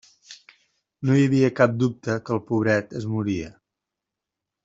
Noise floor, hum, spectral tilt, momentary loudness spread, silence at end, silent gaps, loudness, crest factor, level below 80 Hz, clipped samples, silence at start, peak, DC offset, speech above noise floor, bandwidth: -86 dBFS; none; -7.5 dB/octave; 10 LU; 1.15 s; none; -23 LUFS; 22 dB; -60 dBFS; under 0.1%; 0.3 s; -2 dBFS; under 0.1%; 64 dB; 7.8 kHz